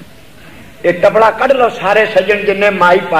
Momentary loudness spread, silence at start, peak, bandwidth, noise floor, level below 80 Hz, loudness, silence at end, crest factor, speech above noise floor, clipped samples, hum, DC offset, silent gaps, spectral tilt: 4 LU; 0 s; 0 dBFS; 15.5 kHz; -38 dBFS; -46 dBFS; -11 LUFS; 0 s; 10 dB; 28 dB; under 0.1%; none; 1%; none; -5 dB/octave